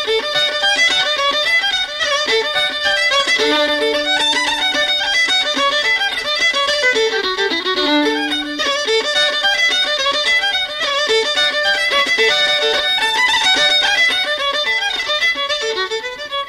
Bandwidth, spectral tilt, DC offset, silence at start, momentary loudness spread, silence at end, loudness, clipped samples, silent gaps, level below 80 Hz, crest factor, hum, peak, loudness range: 15.5 kHz; 0 dB/octave; under 0.1%; 0 s; 5 LU; 0 s; -14 LUFS; under 0.1%; none; -50 dBFS; 12 dB; none; -4 dBFS; 2 LU